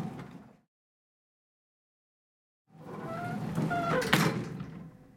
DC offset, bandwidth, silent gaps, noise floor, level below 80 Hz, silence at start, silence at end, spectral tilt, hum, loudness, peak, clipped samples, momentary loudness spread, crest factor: under 0.1%; 16.5 kHz; 0.68-2.65 s; under -90 dBFS; -64 dBFS; 0 s; 0.15 s; -5 dB/octave; none; -31 LUFS; -6 dBFS; under 0.1%; 22 LU; 30 dB